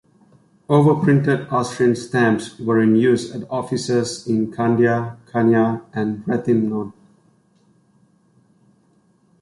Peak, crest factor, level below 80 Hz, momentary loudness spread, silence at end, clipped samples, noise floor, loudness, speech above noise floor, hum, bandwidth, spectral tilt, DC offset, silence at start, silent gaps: -4 dBFS; 16 dB; -58 dBFS; 9 LU; 2.5 s; under 0.1%; -59 dBFS; -19 LUFS; 41 dB; none; 11.5 kHz; -7 dB/octave; under 0.1%; 0.7 s; none